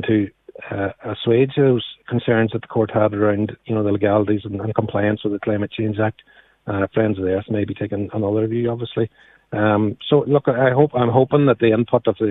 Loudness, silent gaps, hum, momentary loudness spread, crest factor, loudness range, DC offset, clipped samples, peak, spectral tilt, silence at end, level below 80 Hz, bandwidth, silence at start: -19 LUFS; none; none; 9 LU; 18 dB; 5 LU; under 0.1%; under 0.1%; 0 dBFS; -11 dB/octave; 0 s; -54 dBFS; 4.1 kHz; 0 s